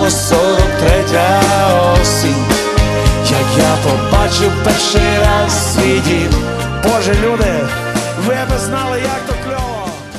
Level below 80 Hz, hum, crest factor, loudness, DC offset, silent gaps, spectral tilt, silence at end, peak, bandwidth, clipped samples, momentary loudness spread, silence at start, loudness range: -22 dBFS; none; 12 dB; -13 LUFS; under 0.1%; none; -4.5 dB/octave; 0 s; 0 dBFS; 13.5 kHz; under 0.1%; 7 LU; 0 s; 4 LU